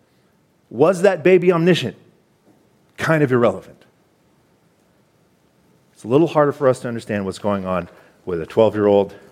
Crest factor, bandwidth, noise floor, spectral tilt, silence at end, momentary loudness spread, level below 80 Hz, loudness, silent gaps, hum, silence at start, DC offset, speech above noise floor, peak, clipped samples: 18 dB; 14 kHz; -59 dBFS; -7 dB/octave; 0.2 s; 14 LU; -60 dBFS; -18 LUFS; none; none; 0.7 s; under 0.1%; 42 dB; -2 dBFS; under 0.1%